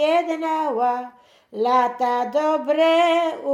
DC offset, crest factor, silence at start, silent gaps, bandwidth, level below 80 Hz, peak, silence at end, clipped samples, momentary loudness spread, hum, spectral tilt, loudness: under 0.1%; 14 dB; 0 s; none; 13 kHz; -78 dBFS; -6 dBFS; 0 s; under 0.1%; 8 LU; none; -3.5 dB/octave; -20 LUFS